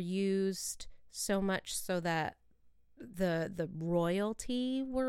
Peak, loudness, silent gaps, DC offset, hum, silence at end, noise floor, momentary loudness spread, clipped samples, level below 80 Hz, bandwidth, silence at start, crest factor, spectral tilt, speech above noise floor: -20 dBFS; -35 LUFS; none; under 0.1%; none; 0 s; -64 dBFS; 9 LU; under 0.1%; -58 dBFS; 16.5 kHz; 0 s; 16 dB; -5 dB/octave; 29 dB